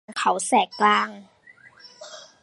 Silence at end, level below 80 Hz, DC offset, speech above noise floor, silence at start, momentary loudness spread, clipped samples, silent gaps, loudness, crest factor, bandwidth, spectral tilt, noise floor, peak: 0.2 s; -78 dBFS; under 0.1%; 30 dB; 0.1 s; 22 LU; under 0.1%; none; -21 LUFS; 20 dB; 11.5 kHz; -2.5 dB/octave; -52 dBFS; -4 dBFS